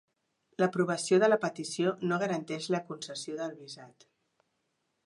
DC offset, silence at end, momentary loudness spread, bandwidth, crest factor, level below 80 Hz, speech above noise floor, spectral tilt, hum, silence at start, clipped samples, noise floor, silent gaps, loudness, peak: under 0.1%; 1.2 s; 17 LU; 11.5 kHz; 18 dB; -82 dBFS; 49 dB; -5 dB/octave; none; 0.6 s; under 0.1%; -79 dBFS; none; -31 LUFS; -14 dBFS